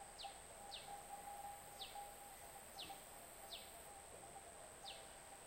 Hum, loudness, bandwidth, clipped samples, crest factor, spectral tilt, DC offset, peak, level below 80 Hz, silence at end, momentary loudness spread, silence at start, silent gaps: none; -54 LUFS; 16 kHz; under 0.1%; 16 dB; -1 dB/octave; under 0.1%; -40 dBFS; -72 dBFS; 0 s; 4 LU; 0 s; none